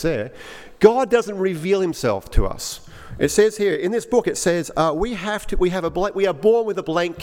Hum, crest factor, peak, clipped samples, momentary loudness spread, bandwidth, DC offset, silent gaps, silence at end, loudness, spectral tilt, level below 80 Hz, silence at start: none; 20 dB; 0 dBFS; under 0.1%; 11 LU; 16.5 kHz; under 0.1%; none; 0 s; -20 LUFS; -5 dB/octave; -32 dBFS; 0 s